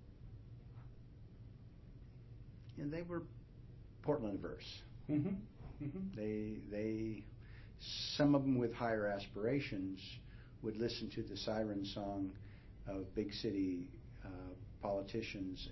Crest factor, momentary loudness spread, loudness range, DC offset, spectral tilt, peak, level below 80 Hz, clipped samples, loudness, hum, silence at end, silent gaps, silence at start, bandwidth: 20 dB; 19 LU; 8 LU; under 0.1%; -5.5 dB/octave; -22 dBFS; -60 dBFS; under 0.1%; -42 LUFS; none; 0 s; none; 0 s; 6 kHz